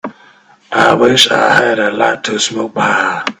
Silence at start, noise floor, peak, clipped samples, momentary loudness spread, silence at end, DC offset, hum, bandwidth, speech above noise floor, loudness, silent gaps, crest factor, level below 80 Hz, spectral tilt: 0.05 s; -45 dBFS; 0 dBFS; 0.1%; 8 LU; 0.05 s; under 0.1%; none; over 20 kHz; 33 dB; -11 LUFS; none; 12 dB; -52 dBFS; -3 dB/octave